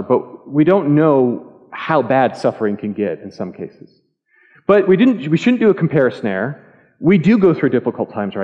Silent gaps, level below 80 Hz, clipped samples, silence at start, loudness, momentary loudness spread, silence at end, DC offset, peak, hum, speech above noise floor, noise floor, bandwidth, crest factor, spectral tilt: none; -60 dBFS; under 0.1%; 0 s; -15 LUFS; 15 LU; 0 s; under 0.1%; -2 dBFS; none; 41 dB; -56 dBFS; 8.2 kHz; 14 dB; -8.5 dB/octave